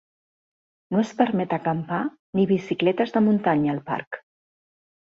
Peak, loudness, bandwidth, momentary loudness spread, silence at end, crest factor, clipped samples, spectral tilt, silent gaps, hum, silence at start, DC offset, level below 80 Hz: -4 dBFS; -23 LUFS; 7.2 kHz; 9 LU; 0.85 s; 20 dB; under 0.1%; -7.5 dB/octave; 2.19-2.33 s, 4.07-4.11 s; none; 0.9 s; under 0.1%; -64 dBFS